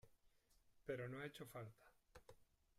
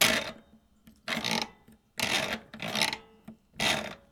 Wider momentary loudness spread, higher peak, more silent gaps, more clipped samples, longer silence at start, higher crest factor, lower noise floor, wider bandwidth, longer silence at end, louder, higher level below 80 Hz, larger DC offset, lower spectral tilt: first, 18 LU vs 13 LU; second, -34 dBFS vs -8 dBFS; neither; neither; about the same, 0.05 s vs 0 s; about the same, 22 dB vs 26 dB; first, -77 dBFS vs -60 dBFS; second, 15.5 kHz vs over 20 kHz; first, 0.35 s vs 0.15 s; second, -53 LUFS vs -30 LUFS; second, -78 dBFS vs -60 dBFS; neither; first, -6 dB/octave vs -1.5 dB/octave